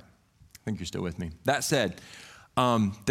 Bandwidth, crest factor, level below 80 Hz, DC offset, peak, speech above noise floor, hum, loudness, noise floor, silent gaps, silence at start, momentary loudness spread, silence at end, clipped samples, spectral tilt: 16.5 kHz; 20 dB; -56 dBFS; under 0.1%; -10 dBFS; 31 dB; none; -29 LUFS; -59 dBFS; none; 0.65 s; 18 LU; 0 s; under 0.1%; -4.5 dB/octave